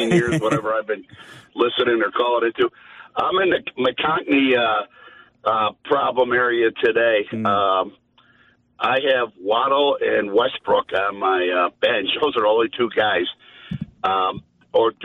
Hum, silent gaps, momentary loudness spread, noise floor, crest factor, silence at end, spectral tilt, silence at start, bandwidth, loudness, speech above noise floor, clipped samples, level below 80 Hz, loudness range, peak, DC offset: none; none; 7 LU; -57 dBFS; 14 dB; 0 s; -5.5 dB/octave; 0 s; 11.5 kHz; -20 LUFS; 37 dB; under 0.1%; -58 dBFS; 2 LU; -6 dBFS; under 0.1%